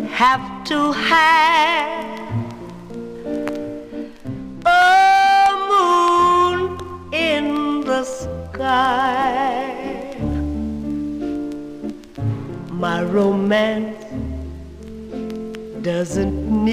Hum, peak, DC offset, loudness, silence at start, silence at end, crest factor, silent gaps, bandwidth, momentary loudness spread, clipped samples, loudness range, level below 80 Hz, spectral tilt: none; -4 dBFS; 0.2%; -18 LUFS; 0 s; 0 s; 16 dB; none; 15.5 kHz; 19 LU; under 0.1%; 9 LU; -38 dBFS; -5 dB/octave